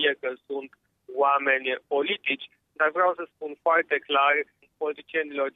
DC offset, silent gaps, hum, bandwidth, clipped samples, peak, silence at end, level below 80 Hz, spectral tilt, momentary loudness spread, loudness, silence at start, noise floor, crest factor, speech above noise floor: under 0.1%; none; none; 4 kHz; under 0.1%; -10 dBFS; 0.05 s; -82 dBFS; -5 dB/octave; 14 LU; -25 LUFS; 0 s; -47 dBFS; 18 dB; 21 dB